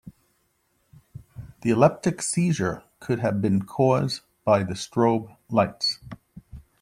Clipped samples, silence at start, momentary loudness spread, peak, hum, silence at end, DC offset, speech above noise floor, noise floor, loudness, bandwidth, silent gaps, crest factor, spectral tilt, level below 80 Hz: under 0.1%; 0.05 s; 17 LU; -4 dBFS; none; 0.2 s; under 0.1%; 47 dB; -69 dBFS; -24 LUFS; 15 kHz; none; 22 dB; -5.5 dB/octave; -56 dBFS